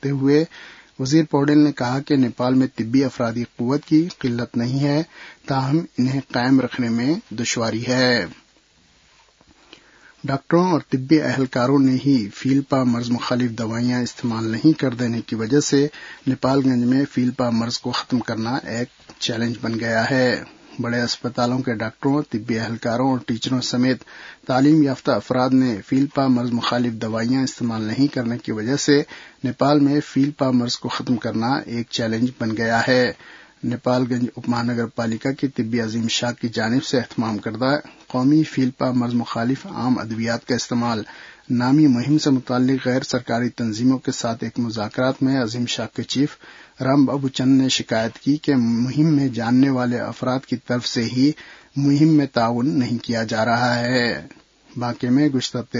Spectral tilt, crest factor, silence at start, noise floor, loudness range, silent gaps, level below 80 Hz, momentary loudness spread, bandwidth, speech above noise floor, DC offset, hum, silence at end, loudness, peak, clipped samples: -5.5 dB/octave; 18 dB; 0.05 s; -57 dBFS; 3 LU; none; -58 dBFS; 8 LU; 7.8 kHz; 37 dB; under 0.1%; none; 0 s; -20 LUFS; -2 dBFS; under 0.1%